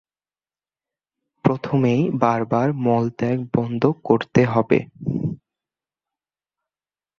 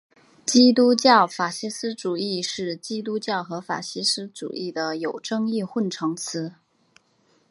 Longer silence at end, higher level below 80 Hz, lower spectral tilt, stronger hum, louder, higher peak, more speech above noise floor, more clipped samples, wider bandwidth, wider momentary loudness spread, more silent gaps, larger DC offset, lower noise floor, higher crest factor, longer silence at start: first, 1.85 s vs 1 s; first, -56 dBFS vs -74 dBFS; first, -8.5 dB/octave vs -3.5 dB/octave; neither; about the same, -21 LUFS vs -23 LUFS; about the same, -2 dBFS vs -2 dBFS; first, over 70 dB vs 41 dB; neither; second, 6.8 kHz vs 11.5 kHz; second, 7 LU vs 14 LU; neither; neither; first, under -90 dBFS vs -64 dBFS; about the same, 20 dB vs 22 dB; first, 1.45 s vs 0.45 s